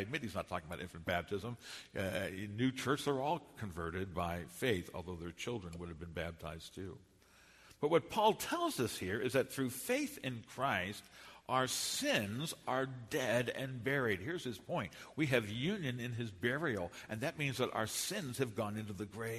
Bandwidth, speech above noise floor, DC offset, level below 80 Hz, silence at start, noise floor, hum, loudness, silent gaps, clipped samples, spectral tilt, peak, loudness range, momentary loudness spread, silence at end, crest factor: 13.5 kHz; 26 dB; under 0.1%; -64 dBFS; 0 s; -64 dBFS; none; -38 LUFS; none; under 0.1%; -4.5 dB/octave; -18 dBFS; 5 LU; 11 LU; 0 s; 22 dB